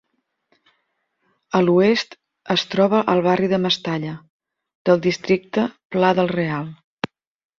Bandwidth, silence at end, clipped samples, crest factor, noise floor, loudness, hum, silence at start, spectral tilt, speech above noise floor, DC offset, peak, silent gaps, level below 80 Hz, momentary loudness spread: 7.4 kHz; 0.55 s; under 0.1%; 20 dB; -71 dBFS; -19 LUFS; none; 1.55 s; -6 dB/octave; 53 dB; under 0.1%; -2 dBFS; 4.30-4.40 s, 4.75-4.85 s, 5.85-5.90 s, 6.84-6.97 s; -60 dBFS; 15 LU